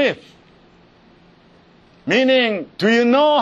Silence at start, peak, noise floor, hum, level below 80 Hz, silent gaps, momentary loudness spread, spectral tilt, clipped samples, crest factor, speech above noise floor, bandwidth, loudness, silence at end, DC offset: 0 s; -4 dBFS; -50 dBFS; none; -62 dBFS; none; 13 LU; -5 dB/octave; under 0.1%; 16 dB; 34 dB; 7.6 kHz; -16 LUFS; 0 s; under 0.1%